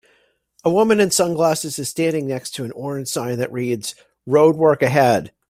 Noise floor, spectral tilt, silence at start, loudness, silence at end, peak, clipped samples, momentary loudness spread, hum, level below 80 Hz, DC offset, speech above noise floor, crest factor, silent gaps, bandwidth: -61 dBFS; -4.5 dB/octave; 0.65 s; -19 LUFS; 0.2 s; -2 dBFS; under 0.1%; 12 LU; none; -58 dBFS; under 0.1%; 43 dB; 16 dB; none; 16 kHz